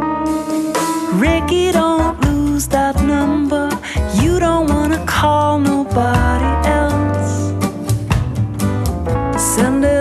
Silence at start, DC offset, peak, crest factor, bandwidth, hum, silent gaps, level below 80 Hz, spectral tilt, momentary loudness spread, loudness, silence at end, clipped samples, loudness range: 0 s; under 0.1%; 0 dBFS; 14 dB; 13 kHz; none; none; -24 dBFS; -5.5 dB/octave; 5 LU; -16 LUFS; 0 s; under 0.1%; 2 LU